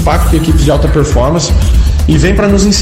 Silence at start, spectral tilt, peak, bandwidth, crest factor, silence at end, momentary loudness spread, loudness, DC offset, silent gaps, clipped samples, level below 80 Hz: 0 s; -5.5 dB/octave; 0 dBFS; 16 kHz; 8 dB; 0 s; 2 LU; -10 LUFS; under 0.1%; none; under 0.1%; -12 dBFS